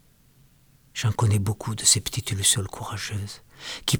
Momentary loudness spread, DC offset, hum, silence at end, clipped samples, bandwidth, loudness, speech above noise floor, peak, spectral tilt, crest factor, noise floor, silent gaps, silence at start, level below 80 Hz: 17 LU; under 0.1%; none; 0 s; under 0.1%; over 20 kHz; -23 LUFS; 33 dB; -4 dBFS; -3 dB/octave; 22 dB; -58 dBFS; none; 0.95 s; -52 dBFS